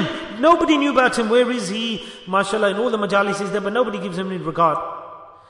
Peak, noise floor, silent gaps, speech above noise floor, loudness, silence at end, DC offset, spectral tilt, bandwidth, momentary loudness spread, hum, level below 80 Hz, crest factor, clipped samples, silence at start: -4 dBFS; -39 dBFS; none; 20 dB; -19 LUFS; 0.2 s; under 0.1%; -4.5 dB/octave; 11 kHz; 10 LU; none; -54 dBFS; 16 dB; under 0.1%; 0 s